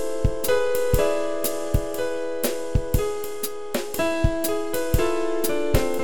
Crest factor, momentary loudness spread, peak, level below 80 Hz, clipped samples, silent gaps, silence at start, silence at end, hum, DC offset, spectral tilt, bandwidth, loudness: 20 dB; 6 LU; -4 dBFS; -32 dBFS; under 0.1%; none; 0 s; 0 s; none; 3%; -5 dB/octave; over 20 kHz; -25 LUFS